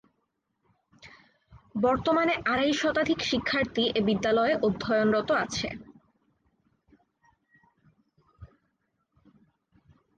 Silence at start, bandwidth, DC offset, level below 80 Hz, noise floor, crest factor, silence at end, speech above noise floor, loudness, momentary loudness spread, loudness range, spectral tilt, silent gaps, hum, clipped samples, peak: 1.05 s; 9.4 kHz; under 0.1%; -58 dBFS; -78 dBFS; 16 dB; 1.7 s; 52 dB; -26 LUFS; 6 LU; 7 LU; -4.5 dB/octave; none; none; under 0.1%; -14 dBFS